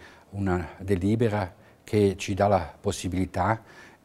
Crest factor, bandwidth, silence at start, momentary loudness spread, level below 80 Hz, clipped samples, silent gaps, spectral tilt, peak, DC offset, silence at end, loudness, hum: 18 dB; 14 kHz; 0 s; 8 LU; -54 dBFS; under 0.1%; none; -6.5 dB/octave; -8 dBFS; under 0.1%; 0.15 s; -27 LUFS; none